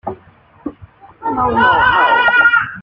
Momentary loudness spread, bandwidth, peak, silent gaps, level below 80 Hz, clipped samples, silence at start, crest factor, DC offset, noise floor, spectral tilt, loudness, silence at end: 21 LU; 5.4 kHz; -2 dBFS; none; -42 dBFS; under 0.1%; 0.05 s; 14 dB; under 0.1%; -46 dBFS; -6.5 dB/octave; -11 LUFS; 0 s